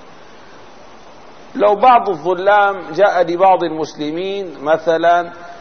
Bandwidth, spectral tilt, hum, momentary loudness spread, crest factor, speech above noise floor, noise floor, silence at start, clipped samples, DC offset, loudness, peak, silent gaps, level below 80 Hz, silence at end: 6.6 kHz; -5.5 dB/octave; none; 11 LU; 14 dB; 26 dB; -41 dBFS; 1.55 s; under 0.1%; 0.9%; -14 LUFS; -2 dBFS; none; -58 dBFS; 0 s